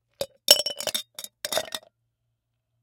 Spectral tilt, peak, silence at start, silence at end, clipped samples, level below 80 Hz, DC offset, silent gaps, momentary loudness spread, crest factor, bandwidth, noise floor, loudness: 1 dB/octave; 0 dBFS; 0.2 s; 1.05 s; under 0.1%; -68 dBFS; under 0.1%; none; 19 LU; 28 dB; 17 kHz; -78 dBFS; -23 LUFS